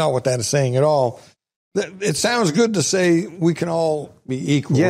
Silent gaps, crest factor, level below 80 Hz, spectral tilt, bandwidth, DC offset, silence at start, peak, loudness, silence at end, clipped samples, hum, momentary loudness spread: 1.56-1.71 s; 14 dB; -58 dBFS; -5 dB/octave; 15.5 kHz; under 0.1%; 0 s; -6 dBFS; -19 LUFS; 0 s; under 0.1%; none; 9 LU